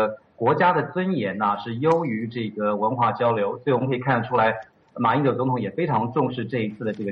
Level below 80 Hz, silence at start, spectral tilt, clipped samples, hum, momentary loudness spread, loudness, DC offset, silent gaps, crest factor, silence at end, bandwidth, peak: -64 dBFS; 0 s; -5.5 dB/octave; under 0.1%; none; 7 LU; -23 LUFS; under 0.1%; none; 16 dB; 0 s; 6.6 kHz; -6 dBFS